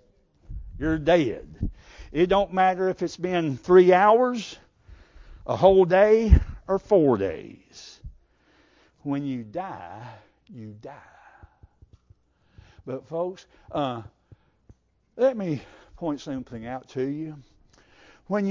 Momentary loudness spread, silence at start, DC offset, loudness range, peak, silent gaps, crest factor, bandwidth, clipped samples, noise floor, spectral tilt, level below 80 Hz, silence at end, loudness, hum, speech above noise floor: 25 LU; 0.5 s; under 0.1%; 16 LU; -2 dBFS; none; 22 dB; 7.4 kHz; under 0.1%; -61 dBFS; -7.5 dB/octave; -36 dBFS; 0 s; -23 LUFS; none; 39 dB